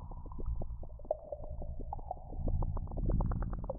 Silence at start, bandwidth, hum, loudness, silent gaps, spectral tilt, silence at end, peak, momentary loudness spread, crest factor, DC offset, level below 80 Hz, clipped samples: 0 s; 1.8 kHz; none; -41 LUFS; none; -9.5 dB/octave; 0 s; -20 dBFS; 10 LU; 16 dB; under 0.1%; -38 dBFS; under 0.1%